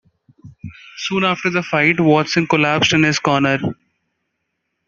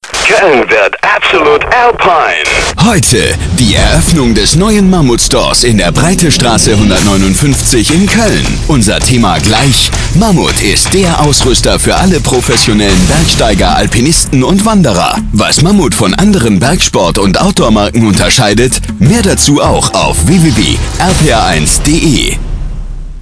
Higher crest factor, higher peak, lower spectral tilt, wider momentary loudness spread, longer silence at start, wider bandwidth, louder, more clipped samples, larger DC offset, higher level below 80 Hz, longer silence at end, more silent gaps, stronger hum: first, 18 dB vs 8 dB; about the same, 0 dBFS vs 0 dBFS; about the same, -5 dB/octave vs -4 dB/octave; first, 19 LU vs 3 LU; first, 0.45 s vs 0 s; second, 7.6 kHz vs 11 kHz; second, -16 LUFS vs -7 LUFS; second, under 0.1% vs 2%; second, under 0.1% vs 0.9%; second, -56 dBFS vs -18 dBFS; first, 1.15 s vs 0 s; neither; neither